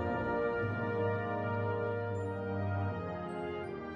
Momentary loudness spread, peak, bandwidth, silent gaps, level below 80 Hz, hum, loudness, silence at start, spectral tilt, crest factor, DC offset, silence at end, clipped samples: 6 LU; -22 dBFS; 7.6 kHz; none; -60 dBFS; none; -36 LUFS; 0 s; -9 dB/octave; 14 dB; under 0.1%; 0 s; under 0.1%